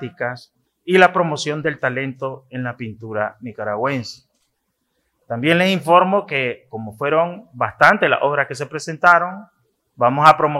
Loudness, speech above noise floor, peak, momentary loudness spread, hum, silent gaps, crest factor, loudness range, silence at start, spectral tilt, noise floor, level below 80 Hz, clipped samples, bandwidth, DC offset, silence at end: -18 LUFS; 53 dB; 0 dBFS; 16 LU; none; none; 18 dB; 9 LU; 0 s; -5.5 dB/octave; -71 dBFS; -64 dBFS; under 0.1%; 15.5 kHz; under 0.1%; 0 s